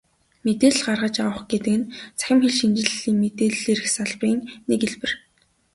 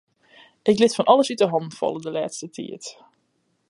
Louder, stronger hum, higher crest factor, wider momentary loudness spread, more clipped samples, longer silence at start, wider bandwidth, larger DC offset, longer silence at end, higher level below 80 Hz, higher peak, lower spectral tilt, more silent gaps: about the same, -22 LUFS vs -21 LUFS; neither; about the same, 20 dB vs 22 dB; second, 10 LU vs 17 LU; neither; second, 0.45 s vs 0.65 s; about the same, 11.5 kHz vs 11.5 kHz; neither; second, 0.55 s vs 0.75 s; first, -58 dBFS vs -70 dBFS; about the same, -2 dBFS vs -2 dBFS; about the same, -3.5 dB/octave vs -4.5 dB/octave; neither